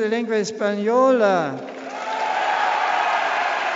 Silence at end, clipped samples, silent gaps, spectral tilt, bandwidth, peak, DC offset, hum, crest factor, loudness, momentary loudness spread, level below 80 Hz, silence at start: 0 s; under 0.1%; none; -2.5 dB/octave; 8 kHz; -6 dBFS; under 0.1%; none; 16 dB; -20 LUFS; 11 LU; -74 dBFS; 0 s